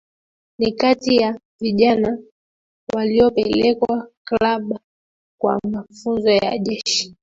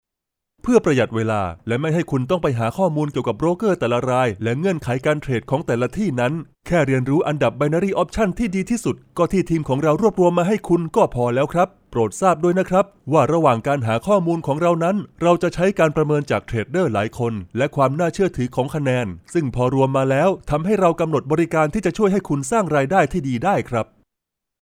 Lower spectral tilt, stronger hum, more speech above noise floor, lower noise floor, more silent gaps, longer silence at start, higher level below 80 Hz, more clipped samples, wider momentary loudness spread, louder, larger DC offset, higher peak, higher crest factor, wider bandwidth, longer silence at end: second, -4.5 dB/octave vs -7 dB/octave; neither; first, over 72 dB vs 64 dB; first, under -90 dBFS vs -83 dBFS; first, 1.45-1.59 s, 2.32-2.87 s, 4.17-4.25 s, 4.84-5.38 s vs none; about the same, 0.6 s vs 0.65 s; second, -50 dBFS vs -44 dBFS; neither; first, 11 LU vs 6 LU; about the same, -19 LUFS vs -20 LUFS; neither; about the same, -2 dBFS vs -2 dBFS; about the same, 16 dB vs 18 dB; second, 7.8 kHz vs 16 kHz; second, 0.1 s vs 0.8 s